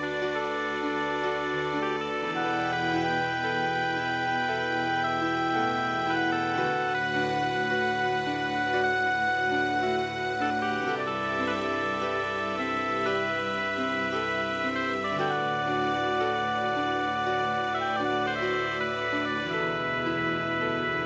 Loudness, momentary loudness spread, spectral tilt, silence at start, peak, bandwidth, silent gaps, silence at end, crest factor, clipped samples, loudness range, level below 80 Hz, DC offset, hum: -27 LUFS; 3 LU; -5 dB/octave; 0 s; -14 dBFS; 8 kHz; none; 0 s; 14 dB; under 0.1%; 1 LU; -58 dBFS; under 0.1%; none